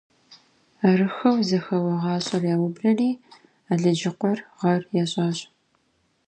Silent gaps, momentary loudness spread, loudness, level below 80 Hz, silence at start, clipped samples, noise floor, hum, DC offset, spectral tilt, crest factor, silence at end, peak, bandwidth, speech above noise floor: none; 6 LU; -23 LUFS; -70 dBFS; 0.3 s; under 0.1%; -68 dBFS; none; under 0.1%; -6.5 dB/octave; 18 dB; 0.85 s; -6 dBFS; 9.2 kHz; 46 dB